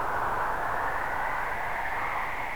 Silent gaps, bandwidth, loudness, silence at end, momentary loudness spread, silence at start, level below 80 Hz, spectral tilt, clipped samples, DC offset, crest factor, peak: none; over 20 kHz; -30 LUFS; 0 s; 2 LU; 0 s; -46 dBFS; -4.5 dB/octave; under 0.1%; 1%; 12 dB; -16 dBFS